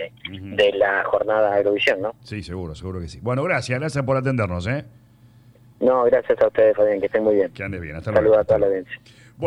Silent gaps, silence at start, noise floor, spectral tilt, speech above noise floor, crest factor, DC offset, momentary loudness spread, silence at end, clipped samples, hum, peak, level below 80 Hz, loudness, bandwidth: none; 0 s; -50 dBFS; -6.5 dB/octave; 30 dB; 14 dB; under 0.1%; 15 LU; 0 s; under 0.1%; none; -6 dBFS; -48 dBFS; -20 LUFS; 10.5 kHz